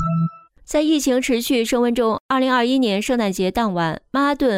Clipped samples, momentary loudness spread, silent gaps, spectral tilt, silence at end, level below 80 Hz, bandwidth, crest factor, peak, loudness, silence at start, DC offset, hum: under 0.1%; 5 LU; 2.20-2.29 s; -5 dB/octave; 0 s; -46 dBFS; 16 kHz; 12 dB; -8 dBFS; -19 LUFS; 0 s; under 0.1%; none